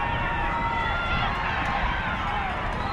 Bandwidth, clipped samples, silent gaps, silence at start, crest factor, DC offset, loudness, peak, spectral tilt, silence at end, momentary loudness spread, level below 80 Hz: 11 kHz; under 0.1%; none; 0 s; 14 dB; under 0.1%; -26 LUFS; -12 dBFS; -5.5 dB/octave; 0 s; 2 LU; -34 dBFS